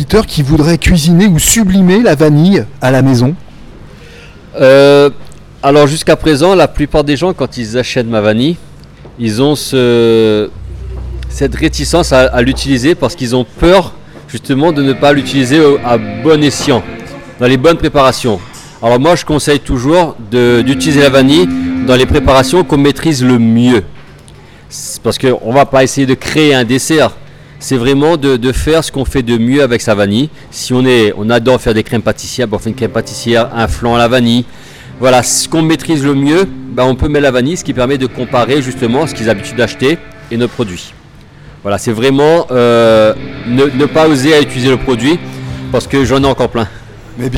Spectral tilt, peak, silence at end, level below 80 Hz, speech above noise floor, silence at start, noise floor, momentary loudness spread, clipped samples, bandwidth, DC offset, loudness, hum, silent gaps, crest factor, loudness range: -5 dB/octave; 0 dBFS; 0 s; -28 dBFS; 27 dB; 0 s; -36 dBFS; 9 LU; 0.3%; 17 kHz; under 0.1%; -10 LUFS; none; none; 10 dB; 4 LU